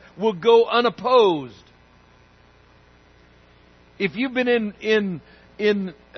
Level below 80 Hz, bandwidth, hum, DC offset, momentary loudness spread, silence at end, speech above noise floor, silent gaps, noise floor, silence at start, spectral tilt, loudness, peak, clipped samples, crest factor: -60 dBFS; 6.4 kHz; none; under 0.1%; 12 LU; 0 s; 33 dB; none; -53 dBFS; 0.15 s; -6 dB/octave; -20 LUFS; -4 dBFS; under 0.1%; 20 dB